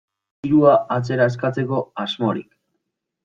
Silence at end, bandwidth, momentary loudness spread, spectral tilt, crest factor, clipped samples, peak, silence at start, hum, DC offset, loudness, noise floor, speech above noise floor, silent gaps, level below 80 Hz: 0.8 s; 7.6 kHz; 12 LU; -7.5 dB/octave; 18 dB; under 0.1%; -2 dBFS; 0.45 s; none; under 0.1%; -19 LUFS; -76 dBFS; 58 dB; none; -60 dBFS